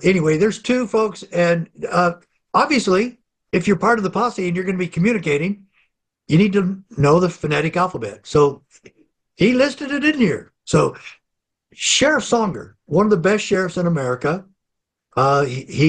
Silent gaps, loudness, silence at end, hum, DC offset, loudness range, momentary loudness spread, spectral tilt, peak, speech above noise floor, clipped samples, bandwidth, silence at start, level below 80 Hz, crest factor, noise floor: none; -18 LUFS; 0 s; none; under 0.1%; 1 LU; 8 LU; -5 dB/octave; -4 dBFS; 62 dB; under 0.1%; 10 kHz; 0 s; -50 dBFS; 16 dB; -80 dBFS